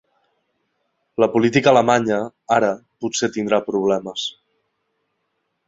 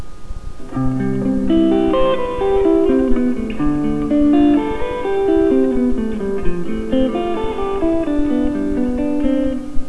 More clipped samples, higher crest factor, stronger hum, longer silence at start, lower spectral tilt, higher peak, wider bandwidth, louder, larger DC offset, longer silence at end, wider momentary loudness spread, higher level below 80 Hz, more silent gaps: neither; first, 20 dB vs 14 dB; neither; first, 1.2 s vs 0 s; second, -4.5 dB/octave vs -8 dB/octave; about the same, -2 dBFS vs -2 dBFS; second, 8 kHz vs 11 kHz; about the same, -19 LUFS vs -17 LUFS; neither; first, 1.35 s vs 0 s; first, 13 LU vs 8 LU; second, -60 dBFS vs -28 dBFS; neither